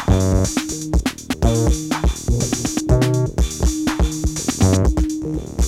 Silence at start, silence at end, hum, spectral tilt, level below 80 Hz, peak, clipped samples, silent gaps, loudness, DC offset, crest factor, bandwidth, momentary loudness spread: 0 s; 0 s; none; -5.5 dB/octave; -22 dBFS; -2 dBFS; under 0.1%; none; -19 LUFS; under 0.1%; 16 dB; 15.5 kHz; 5 LU